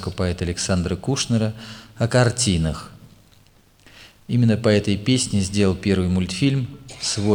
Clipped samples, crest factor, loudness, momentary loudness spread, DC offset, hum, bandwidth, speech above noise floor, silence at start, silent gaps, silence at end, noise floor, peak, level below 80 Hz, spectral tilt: under 0.1%; 20 dB; -21 LUFS; 9 LU; under 0.1%; none; 17 kHz; 33 dB; 0 s; none; 0 s; -54 dBFS; -2 dBFS; -42 dBFS; -5 dB/octave